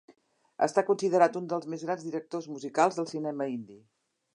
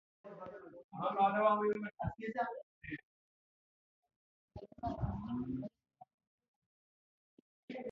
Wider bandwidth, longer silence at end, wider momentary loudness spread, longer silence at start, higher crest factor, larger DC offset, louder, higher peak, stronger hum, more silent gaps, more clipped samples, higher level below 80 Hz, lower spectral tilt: first, 11 kHz vs 6.4 kHz; first, 0.55 s vs 0 s; second, 12 LU vs 21 LU; first, 0.6 s vs 0.25 s; about the same, 22 dB vs 22 dB; neither; first, -29 LUFS vs -37 LUFS; first, -8 dBFS vs -20 dBFS; neither; second, none vs 0.84-0.89 s, 2.63-2.81 s, 3.03-4.03 s, 4.16-4.48 s, 6.14-6.18 s, 6.27-6.38 s, 6.48-7.68 s; neither; second, -84 dBFS vs -60 dBFS; about the same, -5.5 dB/octave vs -6 dB/octave